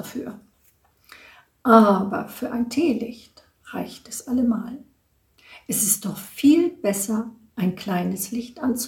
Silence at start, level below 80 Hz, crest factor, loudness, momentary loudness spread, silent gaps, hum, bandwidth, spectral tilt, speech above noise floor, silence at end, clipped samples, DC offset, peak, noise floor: 0 s; -60 dBFS; 24 dB; -22 LUFS; 18 LU; none; none; 18.5 kHz; -5 dB/octave; 41 dB; 0 s; under 0.1%; under 0.1%; 0 dBFS; -63 dBFS